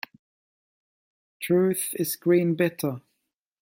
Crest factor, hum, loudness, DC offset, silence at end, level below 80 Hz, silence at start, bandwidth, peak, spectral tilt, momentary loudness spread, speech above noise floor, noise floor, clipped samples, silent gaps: 16 dB; none; -24 LUFS; under 0.1%; 0.6 s; -72 dBFS; 1.4 s; 16.5 kHz; -10 dBFS; -5.5 dB/octave; 15 LU; 56 dB; -80 dBFS; under 0.1%; none